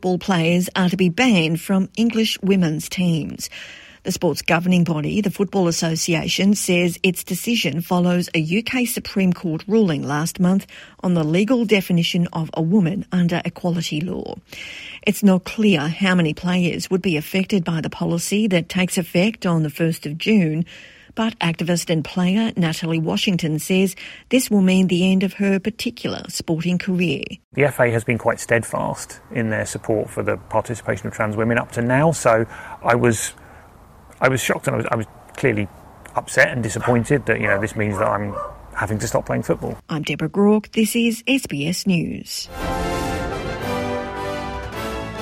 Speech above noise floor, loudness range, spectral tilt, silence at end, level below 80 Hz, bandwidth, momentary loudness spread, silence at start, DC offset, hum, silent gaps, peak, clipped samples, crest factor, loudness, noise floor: 26 dB; 3 LU; -5.5 dB/octave; 0 s; -46 dBFS; 16.5 kHz; 10 LU; 0 s; under 0.1%; none; 27.44-27.51 s; 0 dBFS; under 0.1%; 20 dB; -20 LUFS; -46 dBFS